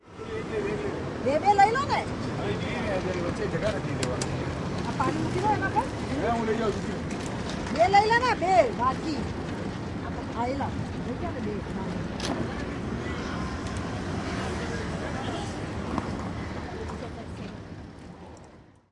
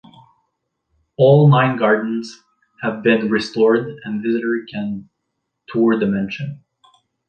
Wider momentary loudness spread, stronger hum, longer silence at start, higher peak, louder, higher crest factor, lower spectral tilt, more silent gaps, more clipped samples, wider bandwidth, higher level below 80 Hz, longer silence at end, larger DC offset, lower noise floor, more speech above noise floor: about the same, 13 LU vs 15 LU; neither; second, 0.05 s vs 1.2 s; second, -8 dBFS vs -2 dBFS; second, -28 LUFS vs -17 LUFS; about the same, 20 dB vs 16 dB; second, -5.5 dB/octave vs -8 dB/octave; neither; neither; first, 11.5 kHz vs 8.6 kHz; first, -46 dBFS vs -60 dBFS; second, 0.3 s vs 0.7 s; neither; second, -51 dBFS vs -75 dBFS; second, 25 dB vs 59 dB